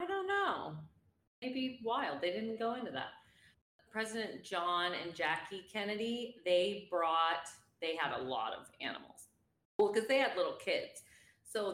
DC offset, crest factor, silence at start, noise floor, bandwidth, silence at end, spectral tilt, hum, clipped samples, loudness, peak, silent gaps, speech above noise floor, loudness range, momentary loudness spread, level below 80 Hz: under 0.1%; 18 dB; 0 s; -57 dBFS; 16 kHz; 0 s; -3.5 dB/octave; none; under 0.1%; -37 LUFS; -20 dBFS; 1.27-1.42 s, 3.61-3.79 s, 9.65-9.79 s; 20 dB; 4 LU; 12 LU; -80 dBFS